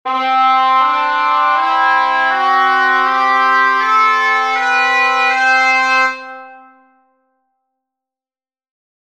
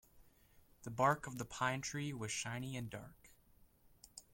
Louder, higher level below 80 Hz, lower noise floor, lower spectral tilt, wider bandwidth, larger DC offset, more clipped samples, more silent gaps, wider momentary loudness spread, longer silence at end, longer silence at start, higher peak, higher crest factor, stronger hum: first, -12 LUFS vs -40 LUFS; about the same, -72 dBFS vs -68 dBFS; first, under -90 dBFS vs -68 dBFS; second, 1 dB/octave vs -4 dB/octave; second, 12.5 kHz vs 16.5 kHz; first, 0.2% vs under 0.1%; neither; neither; second, 3 LU vs 20 LU; first, 2.5 s vs 0.1 s; about the same, 0.05 s vs 0.15 s; first, 0 dBFS vs -20 dBFS; second, 14 dB vs 24 dB; neither